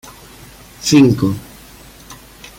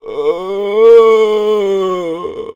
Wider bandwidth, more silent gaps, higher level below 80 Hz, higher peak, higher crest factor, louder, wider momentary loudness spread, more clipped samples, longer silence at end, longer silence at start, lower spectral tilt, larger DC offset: first, 17 kHz vs 7.6 kHz; neither; first, -46 dBFS vs -52 dBFS; about the same, -2 dBFS vs 0 dBFS; about the same, 16 dB vs 12 dB; about the same, -13 LUFS vs -11 LUFS; first, 27 LU vs 13 LU; second, under 0.1% vs 0.6%; first, 0.45 s vs 0.05 s; about the same, 0.05 s vs 0.05 s; about the same, -5.5 dB/octave vs -5.5 dB/octave; neither